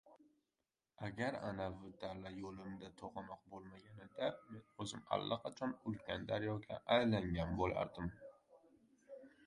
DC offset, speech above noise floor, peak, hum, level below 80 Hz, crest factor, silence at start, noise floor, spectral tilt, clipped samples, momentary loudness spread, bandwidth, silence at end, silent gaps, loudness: under 0.1%; over 47 dB; -22 dBFS; none; -62 dBFS; 22 dB; 0.05 s; under -90 dBFS; -6 dB/octave; under 0.1%; 19 LU; 11 kHz; 0 s; none; -43 LUFS